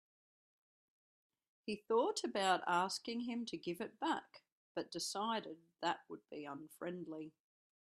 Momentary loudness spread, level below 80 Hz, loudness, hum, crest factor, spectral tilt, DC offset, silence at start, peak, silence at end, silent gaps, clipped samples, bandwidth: 14 LU; -86 dBFS; -41 LUFS; none; 22 dB; -3.5 dB/octave; under 0.1%; 1.65 s; -20 dBFS; 0.5 s; 4.52-4.75 s; under 0.1%; 13 kHz